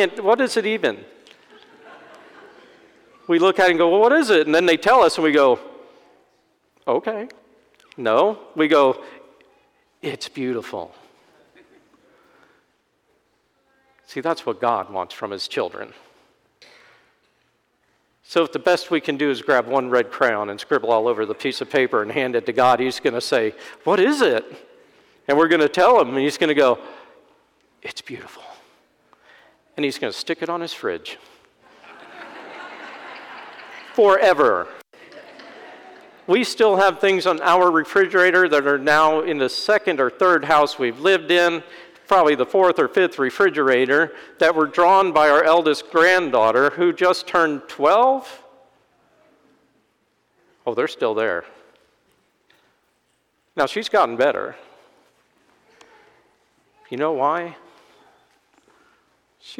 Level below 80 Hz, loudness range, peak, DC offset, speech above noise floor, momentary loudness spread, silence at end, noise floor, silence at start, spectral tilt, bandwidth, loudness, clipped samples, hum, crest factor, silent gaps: -66 dBFS; 13 LU; -6 dBFS; under 0.1%; 49 dB; 19 LU; 0.05 s; -67 dBFS; 0 s; -4 dB/octave; 16.5 kHz; -18 LUFS; under 0.1%; none; 16 dB; none